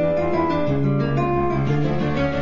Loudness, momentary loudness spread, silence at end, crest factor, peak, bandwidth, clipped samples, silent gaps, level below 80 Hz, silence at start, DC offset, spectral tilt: -21 LUFS; 1 LU; 0 s; 10 dB; -8 dBFS; 7.2 kHz; under 0.1%; none; -38 dBFS; 0 s; under 0.1%; -9 dB/octave